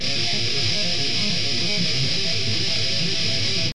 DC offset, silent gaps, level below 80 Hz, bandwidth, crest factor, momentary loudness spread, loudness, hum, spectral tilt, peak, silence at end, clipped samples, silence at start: 6%; none; -48 dBFS; 12.5 kHz; 14 dB; 1 LU; -21 LUFS; none; -3 dB/octave; -10 dBFS; 0 s; under 0.1%; 0 s